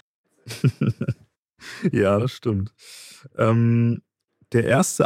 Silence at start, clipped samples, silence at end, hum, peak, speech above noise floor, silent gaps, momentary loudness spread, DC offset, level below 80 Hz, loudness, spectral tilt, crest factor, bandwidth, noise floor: 0.45 s; under 0.1%; 0 s; none; -4 dBFS; 27 dB; 1.38-1.49 s; 20 LU; under 0.1%; -60 dBFS; -22 LUFS; -6.5 dB/octave; 18 dB; 15.5 kHz; -47 dBFS